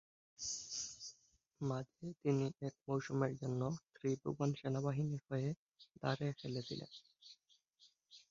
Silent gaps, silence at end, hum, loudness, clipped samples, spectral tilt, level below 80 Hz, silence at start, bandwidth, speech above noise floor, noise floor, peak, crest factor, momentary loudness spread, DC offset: 5.57-5.67 s, 5.91-5.95 s; 0.15 s; none; -42 LUFS; under 0.1%; -6.5 dB/octave; -74 dBFS; 0.4 s; 7.4 kHz; 33 dB; -74 dBFS; -22 dBFS; 22 dB; 14 LU; under 0.1%